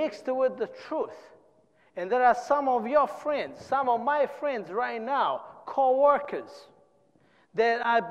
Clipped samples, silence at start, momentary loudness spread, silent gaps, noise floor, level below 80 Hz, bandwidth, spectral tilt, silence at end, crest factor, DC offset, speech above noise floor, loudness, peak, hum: under 0.1%; 0 s; 13 LU; none; -64 dBFS; -70 dBFS; 9.8 kHz; -5 dB/octave; 0 s; 16 dB; under 0.1%; 37 dB; -27 LUFS; -10 dBFS; none